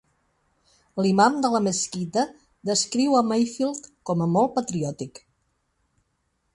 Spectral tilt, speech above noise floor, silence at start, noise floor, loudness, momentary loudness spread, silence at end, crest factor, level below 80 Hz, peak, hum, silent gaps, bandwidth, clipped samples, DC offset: -4.5 dB/octave; 50 dB; 0.95 s; -73 dBFS; -23 LUFS; 14 LU; 1.45 s; 20 dB; -64 dBFS; -6 dBFS; none; none; 11.5 kHz; under 0.1%; under 0.1%